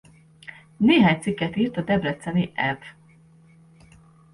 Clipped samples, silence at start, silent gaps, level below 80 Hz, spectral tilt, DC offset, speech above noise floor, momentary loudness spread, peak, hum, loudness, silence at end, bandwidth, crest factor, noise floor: under 0.1%; 0.8 s; none; -56 dBFS; -6.5 dB/octave; under 0.1%; 32 dB; 26 LU; -6 dBFS; none; -22 LUFS; 1.4 s; 11.5 kHz; 18 dB; -53 dBFS